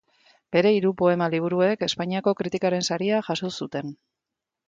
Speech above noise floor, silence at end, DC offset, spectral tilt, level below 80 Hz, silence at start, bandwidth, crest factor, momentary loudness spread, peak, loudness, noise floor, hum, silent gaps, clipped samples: 63 dB; 0.75 s; under 0.1%; -5.5 dB/octave; -66 dBFS; 0.5 s; 9.2 kHz; 18 dB; 10 LU; -6 dBFS; -24 LUFS; -86 dBFS; none; none; under 0.1%